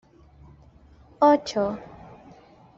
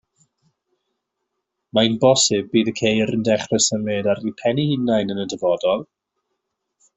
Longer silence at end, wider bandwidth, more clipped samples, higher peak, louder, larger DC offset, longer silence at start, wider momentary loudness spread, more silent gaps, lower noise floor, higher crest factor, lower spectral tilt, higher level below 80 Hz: second, 0.95 s vs 1.15 s; about the same, 7.6 kHz vs 8.2 kHz; neither; second, -6 dBFS vs -2 dBFS; second, -22 LUFS vs -19 LUFS; neither; second, 1.2 s vs 1.75 s; first, 26 LU vs 7 LU; neither; second, -53 dBFS vs -78 dBFS; about the same, 22 dB vs 18 dB; about the same, -4.5 dB/octave vs -4 dB/octave; about the same, -58 dBFS vs -58 dBFS